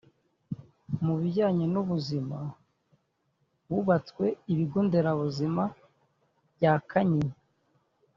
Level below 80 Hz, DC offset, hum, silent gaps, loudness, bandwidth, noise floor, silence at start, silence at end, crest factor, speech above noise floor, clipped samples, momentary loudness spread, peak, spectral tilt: -64 dBFS; under 0.1%; none; none; -28 LUFS; 7.2 kHz; -74 dBFS; 0.5 s; 0.85 s; 20 dB; 47 dB; under 0.1%; 12 LU; -10 dBFS; -7.5 dB/octave